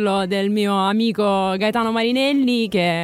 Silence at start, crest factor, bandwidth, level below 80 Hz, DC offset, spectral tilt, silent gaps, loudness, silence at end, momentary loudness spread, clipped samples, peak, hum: 0 s; 12 dB; 15 kHz; -58 dBFS; under 0.1%; -5.5 dB/octave; none; -19 LUFS; 0 s; 2 LU; under 0.1%; -6 dBFS; none